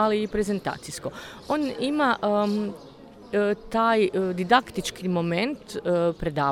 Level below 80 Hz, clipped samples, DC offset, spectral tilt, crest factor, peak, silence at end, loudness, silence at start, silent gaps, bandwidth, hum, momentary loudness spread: -50 dBFS; under 0.1%; under 0.1%; -5.5 dB/octave; 20 dB; -6 dBFS; 0 s; -25 LUFS; 0 s; none; 16.5 kHz; none; 12 LU